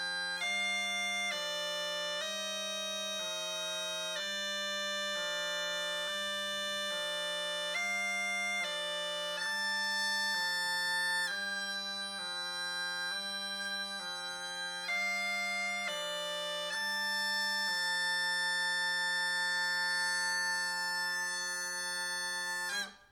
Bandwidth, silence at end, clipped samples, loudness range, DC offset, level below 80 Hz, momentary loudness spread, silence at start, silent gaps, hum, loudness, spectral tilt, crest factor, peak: over 20 kHz; 0.05 s; under 0.1%; 4 LU; under 0.1%; -78 dBFS; 5 LU; 0 s; none; none; -33 LUFS; 0 dB/octave; 12 dB; -24 dBFS